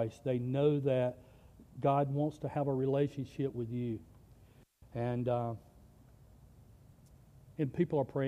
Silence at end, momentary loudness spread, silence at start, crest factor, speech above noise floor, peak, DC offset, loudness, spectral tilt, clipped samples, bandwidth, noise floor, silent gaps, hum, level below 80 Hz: 0 s; 13 LU; 0 s; 18 dB; 28 dB; -18 dBFS; under 0.1%; -34 LUFS; -9 dB/octave; under 0.1%; 10 kHz; -61 dBFS; none; none; -64 dBFS